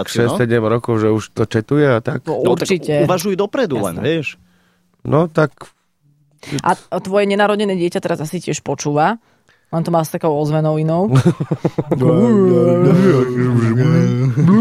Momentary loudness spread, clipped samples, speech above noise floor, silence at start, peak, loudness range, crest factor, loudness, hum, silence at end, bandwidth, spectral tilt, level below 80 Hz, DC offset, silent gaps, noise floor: 9 LU; under 0.1%; 43 dB; 0 s; -2 dBFS; 6 LU; 14 dB; -16 LUFS; none; 0 s; 14.5 kHz; -7 dB/octave; -50 dBFS; under 0.1%; none; -58 dBFS